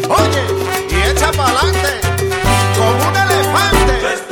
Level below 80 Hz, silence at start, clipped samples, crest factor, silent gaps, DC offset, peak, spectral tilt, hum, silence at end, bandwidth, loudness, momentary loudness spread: -24 dBFS; 0 s; under 0.1%; 12 dB; none; under 0.1%; 0 dBFS; -4 dB/octave; none; 0 s; over 20 kHz; -13 LUFS; 4 LU